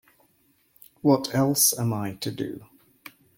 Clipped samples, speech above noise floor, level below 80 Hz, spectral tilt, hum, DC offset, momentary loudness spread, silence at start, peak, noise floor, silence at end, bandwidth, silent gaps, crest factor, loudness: under 0.1%; 41 dB; -66 dBFS; -4 dB/octave; none; under 0.1%; 15 LU; 1.05 s; -6 dBFS; -65 dBFS; 0.75 s; 17 kHz; none; 20 dB; -24 LUFS